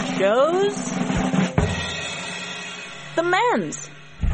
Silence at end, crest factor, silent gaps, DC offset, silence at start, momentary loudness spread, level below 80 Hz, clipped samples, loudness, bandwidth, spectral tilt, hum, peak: 0 s; 18 dB; none; 0.2%; 0 s; 13 LU; -36 dBFS; under 0.1%; -22 LUFS; 8.8 kHz; -5 dB/octave; none; -6 dBFS